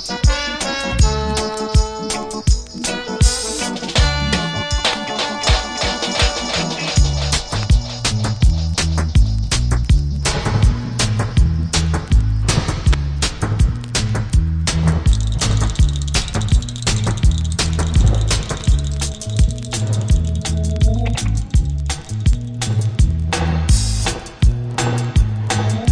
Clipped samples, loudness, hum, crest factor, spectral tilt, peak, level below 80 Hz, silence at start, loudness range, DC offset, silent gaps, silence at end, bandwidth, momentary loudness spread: under 0.1%; -18 LUFS; none; 16 dB; -4.5 dB/octave; 0 dBFS; -20 dBFS; 0 s; 1 LU; under 0.1%; none; 0 s; 10.5 kHz; 4 LU